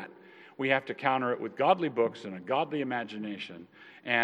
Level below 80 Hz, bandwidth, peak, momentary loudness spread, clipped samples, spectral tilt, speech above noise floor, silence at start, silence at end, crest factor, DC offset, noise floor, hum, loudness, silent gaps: -88 dBFS; 8.8 kHz; -10 dBFS; 18 LU; under 0.1%; -6.5 dB/octave; 23 dB; 0 s; 0 s; 22 dB; under 0.1%; -53 dBFS; none; -30 LUFS; none